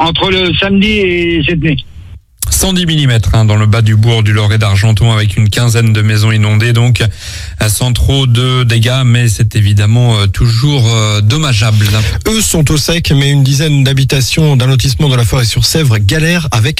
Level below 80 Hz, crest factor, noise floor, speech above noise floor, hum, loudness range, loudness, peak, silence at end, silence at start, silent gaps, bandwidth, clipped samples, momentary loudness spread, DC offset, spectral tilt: -24 dBFS; 8 dB; -31 dBFS; 23 dB; none; 1 LU; -9 LUFS; 0 dBFS; 0 s; 0 s; none; 16 kHz; under 0.1%; 2 LU; under 0.1%; -5 dB/octave